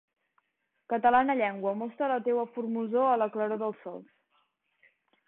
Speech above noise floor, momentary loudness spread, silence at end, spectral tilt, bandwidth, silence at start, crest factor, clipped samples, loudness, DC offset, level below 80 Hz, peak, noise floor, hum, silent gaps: 51 dB; 11 LU; 1.25 s; -9.5 dB/octave; 4.1 kHz; 0.9 s; 18 dB; under 0.1%; -29 LUFS; under 0.1%; -74 dBFS; -12 dBFS; -79 dBFS; none; none